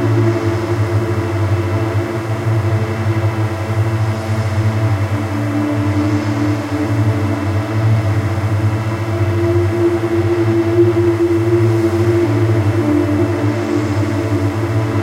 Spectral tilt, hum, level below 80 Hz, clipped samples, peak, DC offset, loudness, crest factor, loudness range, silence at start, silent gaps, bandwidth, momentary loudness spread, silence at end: -8 dB/octave; none; -46 dBFS; under 0.1%; -2 dBFS; under 0.1%; -16 LUFS; 12 dB; 3 LU; 0 s; none; 13 kHz; 4 LU; 0 s